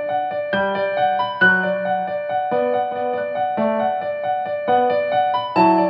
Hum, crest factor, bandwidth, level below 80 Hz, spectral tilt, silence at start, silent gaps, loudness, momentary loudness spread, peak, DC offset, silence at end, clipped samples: none; 16 dB; 5.4 kHz; -62 dBFS; -8 dB/octave; 0 s; none; -20 LUFS; 7 LU; -2 dBFS; under 0.1%; 0 s; under 0.1%